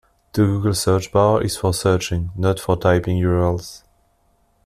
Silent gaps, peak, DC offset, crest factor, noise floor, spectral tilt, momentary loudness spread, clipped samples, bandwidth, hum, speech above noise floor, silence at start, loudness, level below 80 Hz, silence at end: none; -2 dBFS; under 0.1%; 16 dB; -61 dBFS; -6 dB/octave; 6 LU; under 0.1%; 14.5 kHz; none; 43 dB; 0.35 s; -19 LUFS; -42 dBFS; 0.9 s